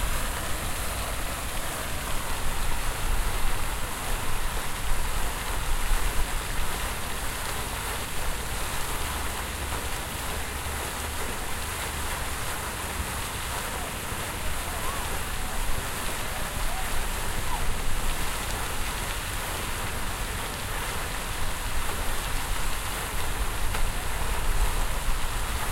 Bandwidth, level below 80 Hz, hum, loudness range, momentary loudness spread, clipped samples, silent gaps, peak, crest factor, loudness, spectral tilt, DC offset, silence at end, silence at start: 16 kHz; -30 dBFS; none; 1 LU; 1 LU; under 0.1%; none; -12 dBFS; 16 dB; -31 LUFS; -2.5 dB/octave; under 0.1%; 0 s; 0 s